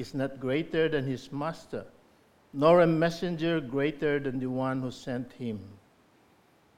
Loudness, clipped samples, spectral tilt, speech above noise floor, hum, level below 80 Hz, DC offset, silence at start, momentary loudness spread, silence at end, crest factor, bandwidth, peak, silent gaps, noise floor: -29 LUFS; under 0.1%; -7 dB/octave; 34 dB; none; -60 dBFS; under 0.1%; 0 s; 15 LU; 1 s; 20 dB; 13.5 kHz; -10 dBFS; none; -63 dBFS